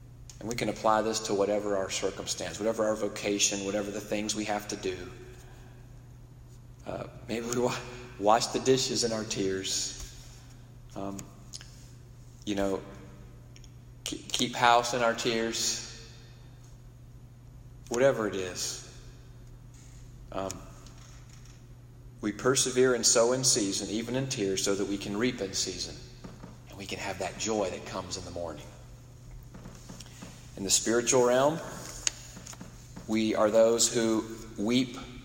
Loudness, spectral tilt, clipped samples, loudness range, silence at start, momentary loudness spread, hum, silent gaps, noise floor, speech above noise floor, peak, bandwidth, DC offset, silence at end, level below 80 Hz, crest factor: -29 LUFS; -3 dB/octave; under 0.1%; 11 LU; 0 s; 25 LU; none; none; -50 dBFS; 21 dB; -6 dBFS; 16.5 kHz; under 0.1%; 0 s; -54 dBFS; 24 dB